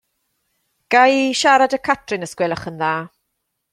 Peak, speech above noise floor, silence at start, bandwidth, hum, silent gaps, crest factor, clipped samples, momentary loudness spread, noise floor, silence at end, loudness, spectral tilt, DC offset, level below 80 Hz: 0 dBFS; 58 dB; 0.9 s; 13.5 kHz; none; none; 18 dB; under 0.1%; 11 LU; -75 dBFS; 0.65 s; -17 LUFS; -3.5 dB/octave; under 0.1%; -60 dBFS